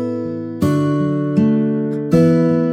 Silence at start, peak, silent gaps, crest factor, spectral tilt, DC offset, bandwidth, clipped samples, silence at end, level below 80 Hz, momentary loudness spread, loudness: 0 s; -2 dBFS; none; 14 dB; -9 dB/octave; under 0.1%; 15.5 kHz; under 0.1%; 0 s; -50 dBFS; 8 LU; -16 LUFS